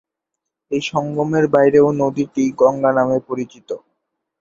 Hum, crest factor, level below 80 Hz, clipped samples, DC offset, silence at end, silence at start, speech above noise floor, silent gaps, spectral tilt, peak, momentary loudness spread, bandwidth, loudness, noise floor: none; 18 dB; -58 dBFS; under 0.1%; under 0.1%; 0.65 s; 0.7 s; 64 dB; none; -6.5 dB/octave; 0 dBFS; 15 LU; 7.6 kHz; -17 LUFS; -81 dBFS